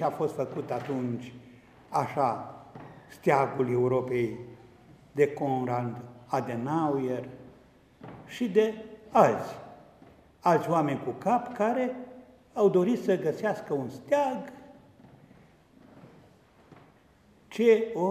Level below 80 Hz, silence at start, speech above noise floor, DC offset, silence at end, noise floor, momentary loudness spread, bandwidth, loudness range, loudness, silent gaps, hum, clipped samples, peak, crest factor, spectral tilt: -68 dBFS; 0 s; 33 dB; under 0.1%; 0 s; -60 dBFS; 21 LU; 15 kHz; 5 LU; -28 LUFS; none; none; under 0.1%; -6 dBFS; 24 dB; -7 dB/octave